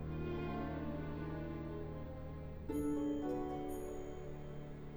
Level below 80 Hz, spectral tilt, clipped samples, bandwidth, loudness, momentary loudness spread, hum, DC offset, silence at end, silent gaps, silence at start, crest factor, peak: -52 dBFS; -8 dB/octave; under 0.1%; over 20 kHz; -43 LUFS; 10 LU; none; under 0.1%; 0 s; none; 0 s; 14 dB; -28 dBFS